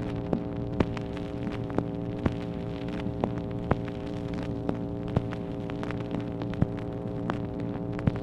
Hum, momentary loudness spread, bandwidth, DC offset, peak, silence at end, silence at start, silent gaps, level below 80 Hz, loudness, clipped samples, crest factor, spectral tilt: none; 4 LU; 9.4 kHz; under 0.1%; -6 dBFS; 0 s; 0 s; none; -44 dBFS; -32 LUFS; under 0.1%; 24 dB; -9 dB/octave